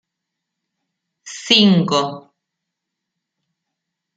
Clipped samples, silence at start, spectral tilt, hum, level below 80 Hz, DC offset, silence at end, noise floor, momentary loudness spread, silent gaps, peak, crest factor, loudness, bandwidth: under 0.1%; 1.25 s; -4.5 dB/octave; none; -66 dBFS; under 0.1%; 1.95 s; -80 dBFS; 20 LU; none; 0 dBFS; 20 dB; -14 LUFS; 9 kHz